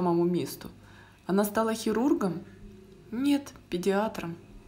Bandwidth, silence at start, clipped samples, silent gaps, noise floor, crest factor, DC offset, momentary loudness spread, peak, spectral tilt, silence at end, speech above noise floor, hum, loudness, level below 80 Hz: 16 kHz; 0 s; under 0.1%; none; -49 dBFS; 18 dB; under 0.1%; 15 LU; -12 dBFS; -6 dB/octave; 0.05 s; 21 dB; none; -29 LUFS; -58 dBFS